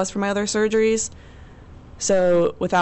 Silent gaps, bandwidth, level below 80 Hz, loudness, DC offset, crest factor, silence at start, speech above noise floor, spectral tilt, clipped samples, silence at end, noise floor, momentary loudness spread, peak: none; 8.4 kHz; -48 dBFS; -20 LUFS; under 0.1%; 12 dB; 0 s; 23 dB; -4 dB/octave; under 0.1%; 0 s; -43 dBFS; 7 LU; -10 dBFS